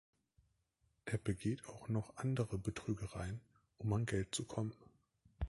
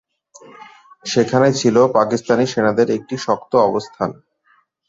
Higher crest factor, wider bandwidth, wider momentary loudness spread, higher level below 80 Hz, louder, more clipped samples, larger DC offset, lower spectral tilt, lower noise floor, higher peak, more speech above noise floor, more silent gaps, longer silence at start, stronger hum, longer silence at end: about the same, 20 dB vs 16 dB; first, 11.5 kHz vs 7.8 kHz; second, 7 LU vs 10 LU; about the same, -56 dBFS vs -58 dBFS; second, -42 LUFS vs -17 LUFS; neither; neither; about the same, -6 dB/octave vs -5.5 dB/octave; first, -80 dBFS vs -59 dBFS; second, -24 dBFS vs -2 dBFS; about the same, 40 dB vs 43 dB; neither; first, 1.05 s vs 0.6 s; neither; second, 0 s vs 0.75 s